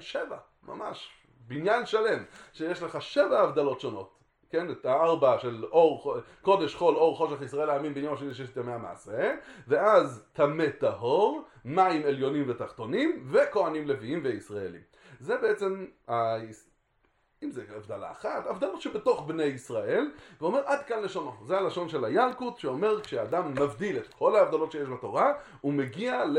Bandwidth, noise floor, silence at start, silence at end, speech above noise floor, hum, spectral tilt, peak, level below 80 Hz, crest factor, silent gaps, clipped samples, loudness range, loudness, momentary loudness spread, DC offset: 11 kHz; -71 dBFS; 0 s; 0 s; 42 dB; none; -6 dB/octave; -8 dBFS; -68 dBFS; 20 dB; none; under 0.1%; 7 LU; -29 LUFS; 15 LU; under 0.1%